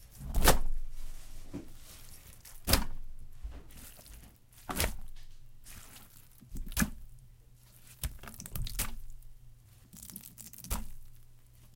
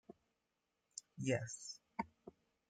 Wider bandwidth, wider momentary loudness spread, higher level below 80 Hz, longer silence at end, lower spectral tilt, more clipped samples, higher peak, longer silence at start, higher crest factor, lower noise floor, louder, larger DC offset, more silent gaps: first, 17 kHz vs 9.4 kHz; first, 25 LU vs 22 LU; first, -38 dBFS vs -80 dBFS; second, 0.05 s vs 0.4 s; second, -3 dB/octave vs -4.5 dB/octave; neither; first, -6 dBFS vs -26 dBFS; about the same, 0 s vs 0.1 s; first, 28 dB vs 22 dB; second, -57 dBFS vs -87 dBFS; first, -35 LUFS vs -45 LUFS; neither; neither